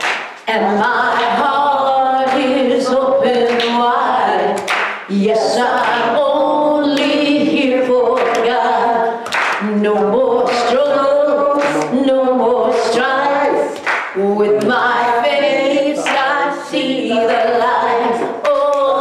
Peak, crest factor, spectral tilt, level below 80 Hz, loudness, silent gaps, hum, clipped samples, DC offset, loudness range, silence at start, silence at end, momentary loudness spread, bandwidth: -6 dBFS; 8 dB; -4.5 dB/octave; -58 dBFS; -14 LUFS; none; none; under 0.1%; under 0.1%; 1 LU; 0 s; 0 s; 4 LU; 13 kHz